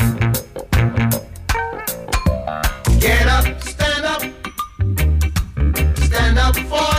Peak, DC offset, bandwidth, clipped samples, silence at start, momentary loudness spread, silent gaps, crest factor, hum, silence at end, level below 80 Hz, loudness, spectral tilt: -4 dBFS; under 0.1%; 16 kHz; under 0.1%; 0 s; 9 LU; none; 12 dB; none; 0 s; -20 dBFS; -18 LUFS; -4.5 dB/octave